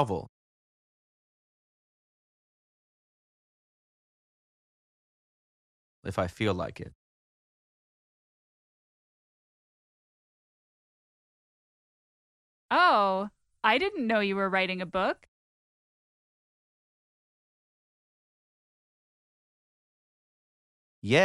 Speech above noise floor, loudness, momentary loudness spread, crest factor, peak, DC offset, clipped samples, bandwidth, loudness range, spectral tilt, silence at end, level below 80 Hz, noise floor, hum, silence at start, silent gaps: over 63 dB; -27 LUFS; 18 LU; 26 dB; -8 dBFS; under 0.1%; under 0.1%; 12 kHz; 13 LU; -5.5 dB/octave; 0 s; -66 dBFS; under -90 dBFS; none; 0 s; 0.29-6.03 s, 6.95-12.69 s, 15.28-21.02 s